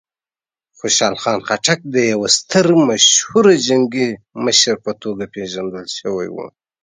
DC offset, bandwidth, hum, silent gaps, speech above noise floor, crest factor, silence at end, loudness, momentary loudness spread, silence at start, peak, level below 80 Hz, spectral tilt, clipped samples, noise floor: under 0.1%; 10 kHz; none; none; over 74 dB; 16 dB; 0.35 s; -15 LUFS; 15 LU; 0.85 s; 0 dBFS; -58 dBFS; -2.5 dB/octave; under 0.1%; under -90 dBFS